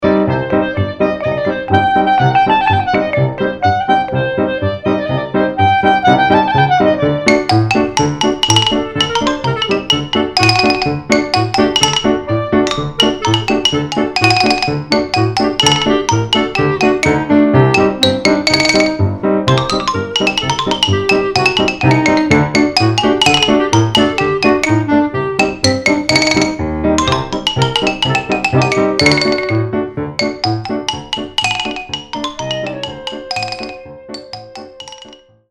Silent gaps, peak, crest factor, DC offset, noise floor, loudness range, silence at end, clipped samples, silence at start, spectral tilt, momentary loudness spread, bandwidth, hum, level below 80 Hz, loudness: none; 0 dBFS; 14 dB; under 0.1%; -40 dBFS; 6 LU; 0.35 s; under 0.1%; 0 s; -4.5 dB/octave; 9 LU; 12 kHz; none; -38 dBFS; -13 LUFS